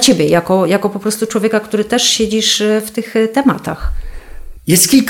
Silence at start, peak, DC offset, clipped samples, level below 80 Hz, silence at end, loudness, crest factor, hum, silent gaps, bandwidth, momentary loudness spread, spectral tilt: 0 s; 0 dBFS; under 0.1%; under 0.1%; -30 dBFS; 0 s; -13 LUFS; 14 dB; none; none; over 20 kHz; 11 LU; -3.5 dB/octave